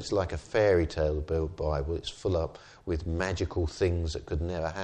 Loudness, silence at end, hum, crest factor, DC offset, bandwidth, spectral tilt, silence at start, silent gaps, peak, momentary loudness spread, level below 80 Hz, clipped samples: -30 LUFS; 0 s; none; 16 dB; under 0.1%; 9.4 kHz; -6.5 dB/octave; 0 s; none; -14 dBFS; 9 LU; -40 dBFS; under 0.1%